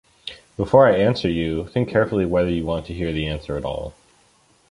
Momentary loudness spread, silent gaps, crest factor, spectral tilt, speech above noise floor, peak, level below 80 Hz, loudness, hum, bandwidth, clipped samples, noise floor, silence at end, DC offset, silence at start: 17 LU; none; 20 dB; -7.5 dB/octave; 38 dB; -2 dBFS; -40 dBFS; -21 LUFS; none; 11 kHz; under 0.1%; -58 dBFS; 0.8 s; under 0.1%; 0.25 s